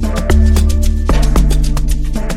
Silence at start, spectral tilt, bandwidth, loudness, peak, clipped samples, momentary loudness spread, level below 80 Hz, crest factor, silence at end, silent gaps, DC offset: 0 s; -6 dB/octave; 15.5 kHz; -14 LUFS; 0 dBFS; under 0.1%; 7 LU; -12 dBFS; 10 dB; 0 s; none; under 0.1%